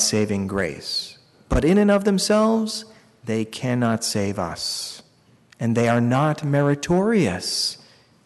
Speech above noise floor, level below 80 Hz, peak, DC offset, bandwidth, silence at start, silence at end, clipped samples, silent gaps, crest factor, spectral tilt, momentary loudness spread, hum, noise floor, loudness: 34 dB; -40 dBFS; -8 dBFS; under 0.1%; 12 kHz; 0 s; 0.5 s; under 0.1%; none; 14 dB; -5 dB/octave; 10 LU; none; -55 dBFS; -21 LUFS